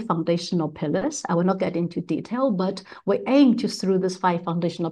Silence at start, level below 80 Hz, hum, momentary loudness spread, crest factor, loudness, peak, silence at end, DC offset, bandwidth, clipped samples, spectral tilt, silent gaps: 0 s; -64 dBFS; none; 9 LU; 16 dB; -23 LUFS; -8 dBFS; 0 s; under 0.1%; 11.5 kHz; under 0.1%; -6.5 dB/octave; none